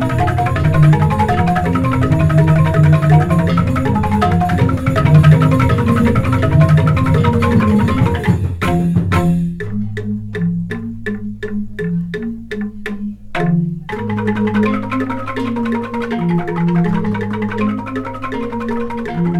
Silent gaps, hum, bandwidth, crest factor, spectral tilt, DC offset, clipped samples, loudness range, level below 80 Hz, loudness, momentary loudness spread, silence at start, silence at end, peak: none; none; 12 kHz; 14 dB; -8.5 dB/octave; under 0.1%; under 0.1%; 9 LU; -34 dBFS; -15 LUFS; 12 LU; 0 s; 0 s; 0 dBFS